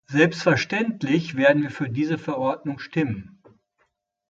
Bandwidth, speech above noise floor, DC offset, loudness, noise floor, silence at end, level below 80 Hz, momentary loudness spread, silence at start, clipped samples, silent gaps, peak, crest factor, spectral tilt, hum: 7.8 kHz; 48 dB; under 0.1%; -23 LUFS; -71 dBFS; 1.05 s; -60 dBFS; 9 LU; 0.1 s; under 0.1%; none; -4 dBFS; 20 dB; -6.5 dB/octave; none